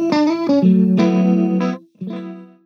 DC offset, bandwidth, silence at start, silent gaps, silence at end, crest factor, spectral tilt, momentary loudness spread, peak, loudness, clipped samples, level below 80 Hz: under 0.1%; 6.6 kHz; 0 s; none; 0.2 s; 14 dB; -8.5 dB/octave; 16 LU; -2 dBFS; -15 LUFS; under 0.1%; -70 dBFS